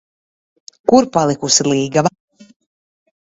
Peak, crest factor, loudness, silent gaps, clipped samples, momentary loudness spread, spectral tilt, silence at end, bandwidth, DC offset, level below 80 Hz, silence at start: 0 dBFS; 18 dB; -15 LUFS; none; under 0.1%; 7 LU; -4 dB/octave; 1.15 s; 7.8 kHz; under 0.1%; -56 dBFS; 0.9 s